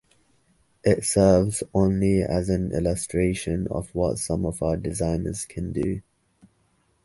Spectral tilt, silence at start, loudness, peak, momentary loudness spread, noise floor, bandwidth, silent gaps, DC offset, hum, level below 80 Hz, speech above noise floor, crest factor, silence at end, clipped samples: -6 dB/octave; 0.85 s; -24 LUFS; -4 dBFS; 10 LU; -66 dBFS; 12 kHz; none; under 0.1%; none; -40 dBFS; 43 dB; 20 dB; 1.05 s; under 0.1%